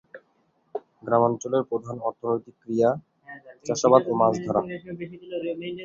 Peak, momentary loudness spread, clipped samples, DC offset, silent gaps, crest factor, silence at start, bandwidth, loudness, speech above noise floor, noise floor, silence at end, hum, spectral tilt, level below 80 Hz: -2 dBFS; 19 LU; under 0.1%; under 0.1%; none; 24 dB; 0.15 s; 7.6 kHz; -25 LUFS; 43 dB; -67 dBFS; 0 s; none; -6 dB/octave; -66 dBFS